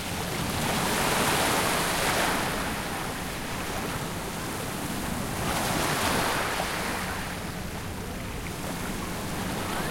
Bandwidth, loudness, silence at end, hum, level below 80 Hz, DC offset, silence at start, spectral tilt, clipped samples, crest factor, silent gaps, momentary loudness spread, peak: 16.5 kHz; -28 LUFS; 0 s; none; -44 dBFS; under 0.1%; 0 s; -3.5 dB/octave; under 0.1%; 18 dB; none; 10 LU; -12 dBFS